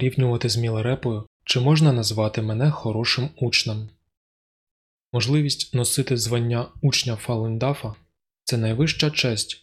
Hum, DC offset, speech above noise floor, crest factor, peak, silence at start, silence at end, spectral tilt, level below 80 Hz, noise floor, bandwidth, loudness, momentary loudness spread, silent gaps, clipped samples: none; under 0.1%; over 68 dB; 16 dB; -6 dBFS; 0 s; 0.05 s; -5 dB/octave; -54 dBFS; under -90 dBFS; 14.5 kHz; -22 LUFS; 9 LU; 1.27-1.40 s, 4.17-5.12 s; under 0.1%